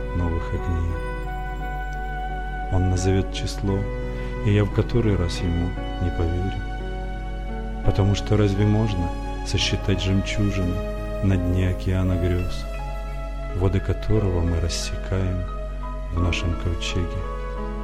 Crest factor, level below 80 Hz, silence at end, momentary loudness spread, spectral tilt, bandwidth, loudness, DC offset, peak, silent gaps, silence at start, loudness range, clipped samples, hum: 18 dB; -28 dBFS; 0 s; 10 LU; -6 dB/octave; 11.5 kHz; -25 LUFS; under 0.1%; -6 dBFS; none; 0 s; 3 LU; under 0.1%; none